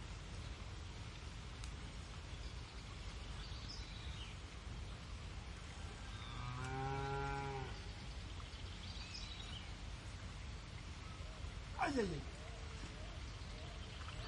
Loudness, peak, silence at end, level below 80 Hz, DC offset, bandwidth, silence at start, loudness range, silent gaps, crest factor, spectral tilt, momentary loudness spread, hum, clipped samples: -48 LUFS; -26 dBFS; 0 s; -52 dBFS; under 0.1%; 11.5 kHz; 0 s; 4 LU; none; 22 dB; -5 dB/octave; 9 LU; none; under 0.1%